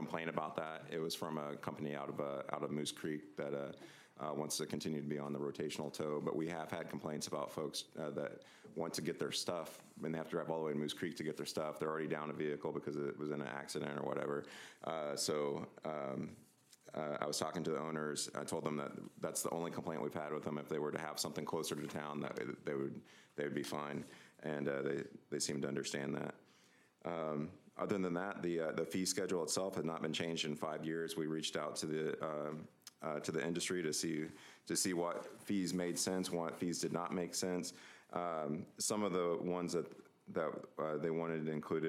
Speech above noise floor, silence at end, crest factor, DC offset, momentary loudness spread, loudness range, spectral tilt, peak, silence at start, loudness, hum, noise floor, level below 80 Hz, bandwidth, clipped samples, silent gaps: 28 dB; 0 s; 20 dB; under 0.1%; 8 LU; 4 LU; -4 dB/octave; -20 dBFS; 0 s; -41 LUFS; none; -69 dBFS; -82 dBFS; 16 kHz; under 0.1%; none